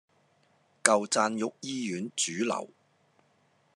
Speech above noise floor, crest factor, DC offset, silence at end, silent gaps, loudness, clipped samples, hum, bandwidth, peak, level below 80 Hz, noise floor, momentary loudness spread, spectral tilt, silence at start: 39 dB; 32 dB; under 0.1%; 1.1 s; none; -29 LUFS; under 0.1%; none; 12.5 kHz; 0 dBFS; -86 dBFS; -68 dBFS; 10 LU; -2.5 dB/octave; 0.85 s